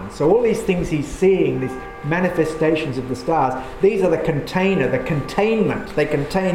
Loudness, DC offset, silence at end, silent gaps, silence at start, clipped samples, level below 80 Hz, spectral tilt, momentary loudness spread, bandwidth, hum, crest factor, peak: -19 LUFS; under 0.1%; 0 s; none; 0 s; under 0.1%; -40 dBFS; -7 dB/octave; 7 LU; 15 kHz; none; 16 dB; -4 dBFS